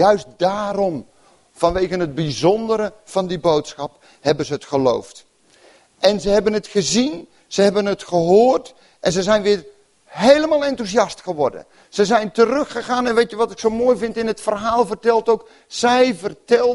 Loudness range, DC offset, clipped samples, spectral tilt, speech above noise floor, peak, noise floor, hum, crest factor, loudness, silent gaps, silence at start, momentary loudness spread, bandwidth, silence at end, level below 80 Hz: 4 LU; under 0.1%; under 0.1%; -4.5 dB/octave; 34 dB; 0 dBFS; -51 dBFS; none; 18 dB; -18 LUFS; none; 0 s; 8 LU; 11.5 kHz; 0 s; -48 dBFS